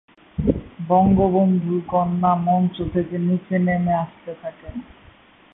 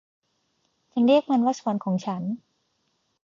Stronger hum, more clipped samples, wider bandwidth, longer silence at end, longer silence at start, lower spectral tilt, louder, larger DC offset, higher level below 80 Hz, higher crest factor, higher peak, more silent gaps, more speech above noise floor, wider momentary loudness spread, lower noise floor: neither; neither; second, 3.8 kHz vs 7.4 kHz; second, 0.7 s vs 0.9 s; second, 0.4 s vs 0.95 s; first, -13 dB/octave vs -7 dB/octave; first, -20 LUFS vs -24 LUFS; neither; first, -40 dBFS vs -74 dBFS; about the same, 16 dB vs 18 dB; about the same, -6 dBFS vs -8 dBFS; neither; second, 30 dB vs 50 dB; first, 17 LU vs 13 LU; second, -50 dBFS vs -73 dBFS